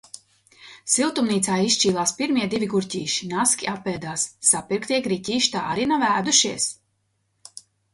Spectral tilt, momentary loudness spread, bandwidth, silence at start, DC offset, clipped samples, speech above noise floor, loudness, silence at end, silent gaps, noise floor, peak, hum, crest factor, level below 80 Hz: -2.5 dB/octave; 9 LU; 11.5 kHz; 0.15 s; under 0.1%; under 0.1%; 48 dB; -21 LUFS; 0.35 s; none; -71 dBFS; -4 dBFS; none; 20 dB; -62 dBFS